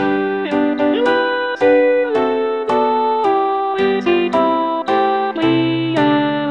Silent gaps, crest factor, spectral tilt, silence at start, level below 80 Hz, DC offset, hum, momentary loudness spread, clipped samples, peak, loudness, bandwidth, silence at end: none; 14 dB; -7 dB/octave; 0 s; -54 dBFS; 0.2%; none; 4 LU; under 0.1%; -2 dBFS; -16 LUFS; 9 kHz; 0 s